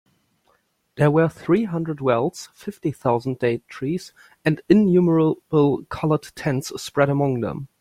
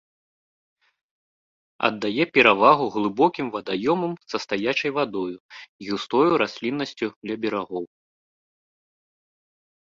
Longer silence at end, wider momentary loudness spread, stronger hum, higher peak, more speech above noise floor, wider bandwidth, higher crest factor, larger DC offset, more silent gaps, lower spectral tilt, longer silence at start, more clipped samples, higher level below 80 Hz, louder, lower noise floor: second, 0.15 s vs 2.05 s; second, 11 LU vs 14 LU; neither; about the same, -2 dBFS vs -2 dBFS; second, 44 dB vs over 67 dB; first, 15 kHz vs 7.6 kHz; about the same, 20 dB vs 24 dB; neither; second, none vs 5.40-5.49 s, 5.68-5.79 s, 7.16-7.22 s; first, -7.5 dB/octave vs -5.5 dB/octave; second, 0.95 s vs 1.8 s; neither; first, -56 dBFS vs -66 dBFS; about the same, -21 LUFS vs -23 LUFS; second, -65 dBFS vs under -90 dBFS